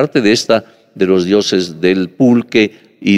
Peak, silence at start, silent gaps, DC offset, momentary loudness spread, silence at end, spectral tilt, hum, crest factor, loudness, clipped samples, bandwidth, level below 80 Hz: 0 dBFS; 0 s; none; under 0.1%; 5 LU; 0 s; -5 dB/octave; none; 12 dB; -13 LUFS; under 0.1%; 13.5 kHz; -54 dBFS